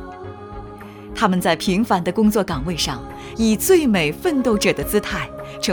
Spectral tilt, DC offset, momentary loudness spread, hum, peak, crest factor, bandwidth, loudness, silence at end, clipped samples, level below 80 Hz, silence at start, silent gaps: -4.5 dB/octave; under 0.1%; 20 LU; none; -4 dBFS; 16 dB; over 20 kHz; -19 LUFS; 0 s; under 0.1%; -40 dBFS; 0 s; none